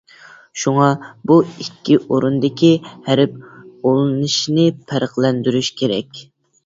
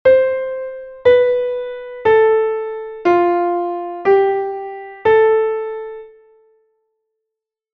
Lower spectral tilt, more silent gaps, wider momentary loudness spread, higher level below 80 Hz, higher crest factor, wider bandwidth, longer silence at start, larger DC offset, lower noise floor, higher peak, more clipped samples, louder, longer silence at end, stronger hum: second, -5.5 dB/octave vs -7 dB/octave; neither; second, 10 LU vs 15 LU; about the same, -58 dBFS vs -54 dBFS; about the same, 16 dB vs 16 dB; first, 7.8 kHz vs 5.6 kHz; first, 0.55 s vs 0.05 s; neither; second, -44 dBFS vs -82 dBFS; about the same, 0 dBFS vs -2 dBFS; neither; about the same, -17 LUFS vs -16 LUFS; second, 0.45 s vs 1.65 s; neither